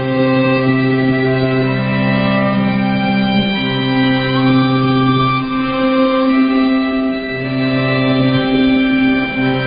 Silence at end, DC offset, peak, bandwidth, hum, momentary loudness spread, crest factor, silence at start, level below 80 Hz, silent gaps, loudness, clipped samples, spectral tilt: 0 s; under 0.1%; -2 dBFS; 5.2 kHz; none; 3 LU; 12 dB; 0 s; -40 dBFS; none; -14 LUFS; under 0.1%; -12.5 dB/octave